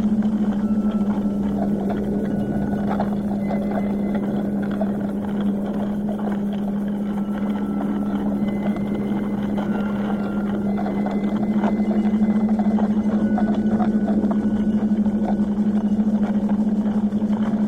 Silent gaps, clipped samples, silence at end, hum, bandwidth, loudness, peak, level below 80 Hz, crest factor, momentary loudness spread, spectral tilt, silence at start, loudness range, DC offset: none; under 0.1%; 0 s; none; 4.5 kHz; -22 LUFS; -8 dBFS; -44 dBFS; 14 dB; 4 LU; -9 dB/octave; 0 s; 4 LU; under 0.1%